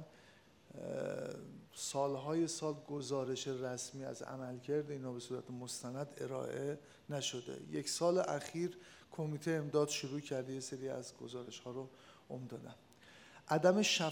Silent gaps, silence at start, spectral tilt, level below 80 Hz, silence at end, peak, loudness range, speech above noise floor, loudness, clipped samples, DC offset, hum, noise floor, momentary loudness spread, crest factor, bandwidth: none; 0 s; -4 dB/octave; -84 dBFS; 0 s; -16 dBFS; 5 LU; 25 dB; -40 LUFS; under 0.1%; under 0.1%; none; -65 dBFS; 17 LU; 24 dB; 19 kHz